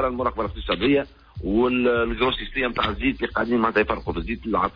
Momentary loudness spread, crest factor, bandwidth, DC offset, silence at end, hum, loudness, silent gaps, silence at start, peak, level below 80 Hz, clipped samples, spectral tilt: 8 LU; 14 dB; 5.4 kHz; under 0.1%; 0.05 s; none; -23 LUFS; none; 0 s; -8 dBFS; -38 dBFS; under 0.1%; -8 dB/octave